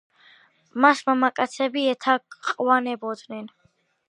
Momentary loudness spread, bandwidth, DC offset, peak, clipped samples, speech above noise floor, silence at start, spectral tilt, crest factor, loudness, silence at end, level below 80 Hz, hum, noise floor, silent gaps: 17 LU; 11 kHz; under 0.1%; -2 dBFS; under 0.1%; 33 dB; 0.75 s; -3.5 dB/octave; 22 dB; -22 LUFS; 0.6 s; -80 dBFS; none; -56 dBFS; none